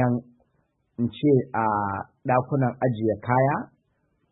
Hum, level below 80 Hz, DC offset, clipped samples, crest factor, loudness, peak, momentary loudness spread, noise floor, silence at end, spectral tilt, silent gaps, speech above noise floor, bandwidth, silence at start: none; -60 dBFS; under 0.1%; under 0.1%; 18 dB; -25 LUFS; -6 dBFS; 9 LU; -70 dBFS; 0.65 s; -12.5 dB/octave; none; 47 dB; 4 kHz; 0 s